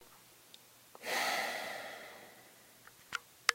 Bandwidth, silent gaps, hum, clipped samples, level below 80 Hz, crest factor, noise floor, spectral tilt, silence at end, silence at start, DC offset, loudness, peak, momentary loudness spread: 16 kHz; none; none; under 0.1%; -84 dBFS; 32 dB; -61 dBFS; 0 dB/octave; 0 s; 0 s; under 0.1%; -38 LUFS; -8 dBFS; 24 LU